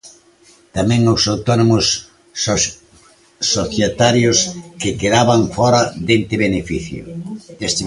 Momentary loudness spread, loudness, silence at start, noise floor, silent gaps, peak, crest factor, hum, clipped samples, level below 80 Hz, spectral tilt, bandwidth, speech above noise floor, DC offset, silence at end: 13 LU; -16 LUFS; 0.05 s; -50 dBFS; none; 0 dBFS; 16 dB; none; under 0.1%; -40 dBFS; -4 dB/octave; 11.5 kHz; 34 dB; under 0.1%; 0 s